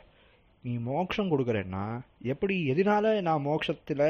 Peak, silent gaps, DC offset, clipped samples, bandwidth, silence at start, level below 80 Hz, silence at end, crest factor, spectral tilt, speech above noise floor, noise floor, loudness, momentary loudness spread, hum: -14 dBFS; none; under 0.1%; under 0.1%; 6.8 kHz; 0.65 s; -60 dBFS; 0 s; 16 dB; -5.5 dB/octave; 33 dB; -61 dBFS; -29 LUFS; 11 LU; none